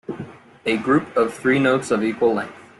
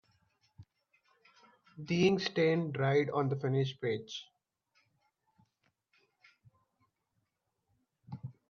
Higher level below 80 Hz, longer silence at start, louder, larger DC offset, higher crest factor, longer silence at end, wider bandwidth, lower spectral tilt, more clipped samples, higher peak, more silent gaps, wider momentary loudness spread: first, -60 dBFS vs -76 dBFS; second, 0.1 s vs 0.6 s; first, -20 LUFS vs -32 LUFS; neither; second, 16 dB vs 22 dB; about the same, 0.2 s vs 0.2 s; first, 12 kHz vs 7 kHz; about the same, -6 dB/octave vs -6.5 dB/octave; neither; first, -6 dBFS vs -16 dBFS; neither; second, 14 LU vs 19 LU